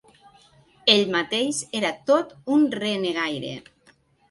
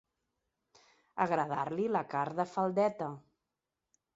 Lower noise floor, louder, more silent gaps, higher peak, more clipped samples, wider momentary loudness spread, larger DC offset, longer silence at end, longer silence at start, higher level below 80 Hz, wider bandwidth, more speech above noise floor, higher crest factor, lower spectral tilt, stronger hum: second, -60 dBFS vs -88 dBFS; first, -22 LUFS vs -33 LUFS; neither; first, -2 dBFS vs -14 dBFS; neither; about the same, 9 LU vs 11 LU; neither; second, 0.7 s vs 0.95 s; second, 0.85 s vs 1.15 s; first, -68 dBFS vs -78 dBFS; first, 11.5 kHz vs 7.6 kHz; second, 37 dB vs 56 dB; about the same, 22 dB vs 22 dB; second, -3.5 dB/octave vs -6 dB/octave; neither